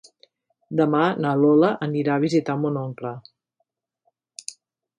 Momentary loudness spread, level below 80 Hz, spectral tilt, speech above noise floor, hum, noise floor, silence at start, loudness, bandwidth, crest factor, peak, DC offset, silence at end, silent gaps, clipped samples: 19 LU; -72 dBFS; -7 dB/octave; 55 dB; none; -76 dBFS; 0.7 s; -21 LUFS; 11.5 kHz; 18 dB; -6 dBFS; under 0.1%; 0.45 s; none; under 0.1%